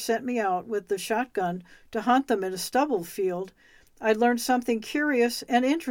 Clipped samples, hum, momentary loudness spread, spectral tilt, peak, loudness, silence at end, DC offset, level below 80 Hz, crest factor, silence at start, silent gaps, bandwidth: under 0.1%; none; 7 LU; -4 dB/octave; -10 dBFS; -26 LUFS; 0 s; under 0.1%; -64 dBFS; 16 dB; 0 s; none; 18.5 kHz